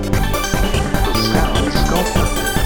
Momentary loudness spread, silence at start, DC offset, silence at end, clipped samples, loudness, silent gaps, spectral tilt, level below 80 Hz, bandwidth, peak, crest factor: 2 LU; 0 s; under 0.1%; 0 s; under 0.1%; -17 LUFS; none; -4.5 dB/octave; -20 dBFS; over 20 kHz; 0 dBFS; 16 dB